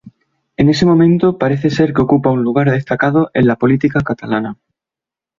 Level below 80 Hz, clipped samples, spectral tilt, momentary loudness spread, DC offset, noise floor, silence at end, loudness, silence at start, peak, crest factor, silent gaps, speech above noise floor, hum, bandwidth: -44 dBFS; under 0.1%; -8 dB/octave; 8 LU; under 0.1%; -87 dBFS; 0.85 s; -13 LUFS; 0.05 s; -2 dBFS; 12 dB; none; 75 dB; none; 7.4 kHz